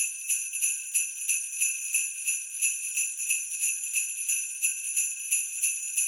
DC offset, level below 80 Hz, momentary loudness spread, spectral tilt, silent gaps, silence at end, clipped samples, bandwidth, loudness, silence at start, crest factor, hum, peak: under 0.1%; under -90 dBFS; 2 LU; 10.5 dB/octave; none; 0 s; under 0.1%; 17 kHz; -26 LUFS; 0 s; 20 dB; none; -10 dBFS